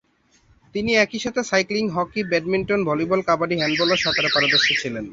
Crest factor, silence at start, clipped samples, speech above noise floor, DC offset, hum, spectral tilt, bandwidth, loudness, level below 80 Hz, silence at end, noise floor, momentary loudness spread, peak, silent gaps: 18 dB; 0.75 s; under 0.1%; 38 dB; under 0.1%; none; -4 dB/octave; 7.8 kHz; -20 LUFS; -54 dBFS; 0 s; -59 dBFS; 7 LU; -4 dBFS; none